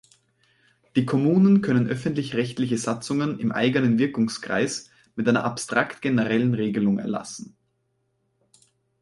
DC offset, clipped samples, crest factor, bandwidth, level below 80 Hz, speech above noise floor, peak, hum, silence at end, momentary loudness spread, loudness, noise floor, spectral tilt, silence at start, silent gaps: under 0.1%; under 0.1%; 18 dB; 11.5 kHz; -62 dBFS; 50 dB; -6 dBFS; none; 1.55 s; 8 LU; -23 LUFS; -72 dBFS; -6 dB/octave; 0.95 s; none